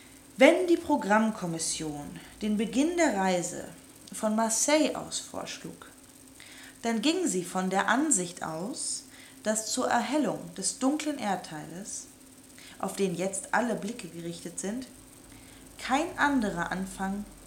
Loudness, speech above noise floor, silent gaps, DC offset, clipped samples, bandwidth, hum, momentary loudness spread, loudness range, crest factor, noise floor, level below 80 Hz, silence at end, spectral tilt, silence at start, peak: -29 LUFS; 24 dB; none; under 0.1%; under 0.1%; 17.5 kHz; none; 21 LU; 5 LU; 24 dB; -52 dBFS; -60 dBFS; 0 s; -3.5 dB/octave; 0 s; -6 dBFS